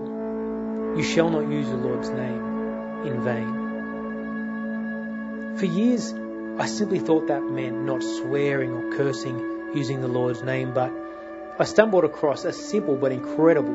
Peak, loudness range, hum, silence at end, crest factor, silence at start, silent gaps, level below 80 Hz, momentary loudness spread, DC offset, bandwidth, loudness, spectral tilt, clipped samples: 0 dBFS; 4 LU; none; 0 s; 24 dB; 0 s; none; -60 dBFS; 10 LU; under 0.1%; 8 kHz; -25 LUFS; -6 dB/octave; under 0.1%